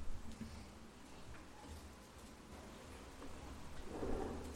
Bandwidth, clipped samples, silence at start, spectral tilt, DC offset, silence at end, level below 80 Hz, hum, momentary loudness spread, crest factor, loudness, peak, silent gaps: 16 kHz; under 0.1%; 0 s; -5.5 dB/octave; under 0.1%; 0 s; -54 dBFS; none; 12 LU; 18 dB; -52 LUFS; -30 dBFS; none